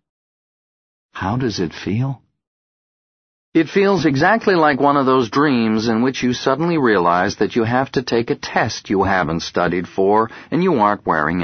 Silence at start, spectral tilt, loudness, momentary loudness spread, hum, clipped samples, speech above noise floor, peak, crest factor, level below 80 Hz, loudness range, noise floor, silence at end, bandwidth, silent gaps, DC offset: 1.15 s; -6 dB/octave; -17 LUFS; 7 LU; none; under 0.1%; over 73 dB; 0 dBFS; 16 dB; -48 dBFS; 7 LU; under -90 dBFS; 0 s; 6.6 kHz; 2.47-3.52 s; under 0.1%